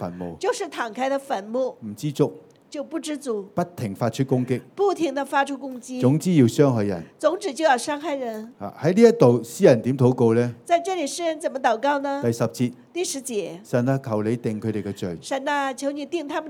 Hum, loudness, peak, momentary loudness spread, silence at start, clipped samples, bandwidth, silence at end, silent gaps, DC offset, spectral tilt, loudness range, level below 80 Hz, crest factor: none; -23 LUFS; -2 dBFS; 11 LU; 0 s; under 0.1%; 17 kHz; 0 s; none; under 0.1%; -6 dB/octave; 7 LU; -68 dBFS; 20 dB